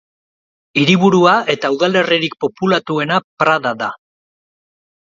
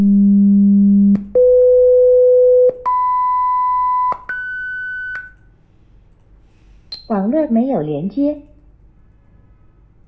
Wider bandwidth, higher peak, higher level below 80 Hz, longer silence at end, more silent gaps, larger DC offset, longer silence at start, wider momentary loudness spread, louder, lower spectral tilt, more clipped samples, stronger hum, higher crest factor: first, 7.6 kHz vs 4.8 kHz; first, 0 dBFS vs -6 dBFS; second, -60 dBFS vs -46 dBFS; second, 1.2 s vs 1.65 s; first, 3.24-3.37 s vs none; neither; first, 0.75 s vs 0 s; second, 10 LU vs 13 LU; about the same, -15 LUFS vs -14 LUFS; second, -5.5 dB/octave vs -11 dB/octave; neither; neither; first, 16 dB vs 10 dB